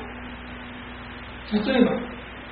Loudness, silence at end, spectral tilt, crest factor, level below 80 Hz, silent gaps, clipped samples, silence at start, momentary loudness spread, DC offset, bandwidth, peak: -25 LUFS; 0 s; -4.5 dB/octave; 22 dB; -46 dBFS; none; under 0.1%; 0 s; 17 LU; under 0.1%; 4.9 kHz; -4 dBFS